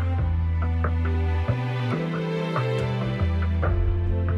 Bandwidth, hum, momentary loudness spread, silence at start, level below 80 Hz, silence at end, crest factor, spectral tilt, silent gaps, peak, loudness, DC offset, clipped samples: 6 kHz; none; 2 LU; 0 s; -30 dBFS; 0 s; 12 dB; -8.5 dB/octave; none; -12 dBFS; -25 LUFS; under 0.1%; under 0.1%